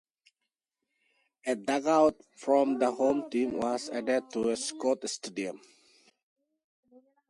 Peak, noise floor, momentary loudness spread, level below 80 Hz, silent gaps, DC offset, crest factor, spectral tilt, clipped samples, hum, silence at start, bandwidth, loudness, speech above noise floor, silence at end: -12 dBFS; -87 dBFS; 12 LU; -72 dBFS; none; under 0.1%; 20 dB; -3.5 dB/octave; under 0.1%; none; 1.45 s; 11.5 kHz; -29 LUFS; 58 dB; 1.75 s